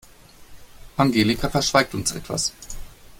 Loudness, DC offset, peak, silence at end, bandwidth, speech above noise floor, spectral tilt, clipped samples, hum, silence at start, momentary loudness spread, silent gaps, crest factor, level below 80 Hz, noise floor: -22 LUFS; under 0.1%; -4 dBFS; 0.25 s; 17 kHz; 25 dB; -4 dB/octave; under 0.1%; none; 0.4 s; 19 LU; none; 20 dB; -42 dBFS; -46 dBFS